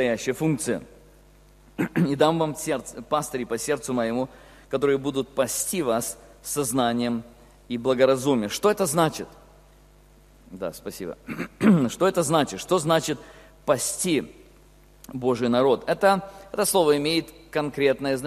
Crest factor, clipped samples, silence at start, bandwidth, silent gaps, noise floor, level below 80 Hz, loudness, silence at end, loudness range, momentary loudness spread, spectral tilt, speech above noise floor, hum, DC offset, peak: 20 dB; under 0.1%; 0 s; 14.5 kHz; none; -53 dBFS; -54 dBFS; -24 LUFS; 0 s; 3 LU; 14 LU; -4.5 dB/octave; 29 dB; 50 Hz at -55 dBFS; under 0.1%; -4 dBFS